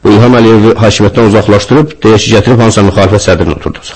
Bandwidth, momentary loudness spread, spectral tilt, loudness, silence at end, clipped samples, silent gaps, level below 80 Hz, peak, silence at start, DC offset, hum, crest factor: 8.8 kHz; 5 LU; -6 dB/octave; -6 LUFS; 0 s; 5%; none; -28 dBFS; 0 dBFS; 0.05 s; under 0.1%; none; 6 dB